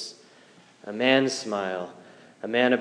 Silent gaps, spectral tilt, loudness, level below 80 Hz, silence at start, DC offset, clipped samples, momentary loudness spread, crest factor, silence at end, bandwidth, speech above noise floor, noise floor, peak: none; -4 dB/octave; -25 LUFS; -88 dBFS; 0 s; under 0.1%; under 0.1%; 18 LU; 20 dB; 0 s; 10.5 kHz; 30 dB; -55 dBFS; -6 dBFS